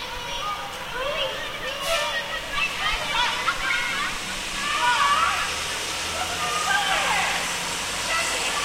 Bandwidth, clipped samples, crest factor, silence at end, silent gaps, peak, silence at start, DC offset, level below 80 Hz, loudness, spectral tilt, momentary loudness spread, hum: 16 kHz; under 0.1%; 16 dB; 0 s; none; -8 dBFS; 0 s; under 0.1%; -44 dBFS; -24 LUFS; -0.5 dB/octave; 8 LU; none